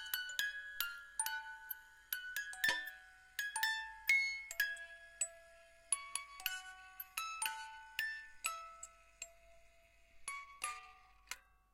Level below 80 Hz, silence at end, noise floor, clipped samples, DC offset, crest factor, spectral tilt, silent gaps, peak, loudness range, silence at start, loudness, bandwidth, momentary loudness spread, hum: -74 dBFS; 0.35 s; -67 dBFS; under 0.1%; under 0.1%; 26 dB; 2.5 dB/octave; none; -18 dBFS; 9 LU; 0 s; -41 LUFS; 16.5 kHz; 16 LU; none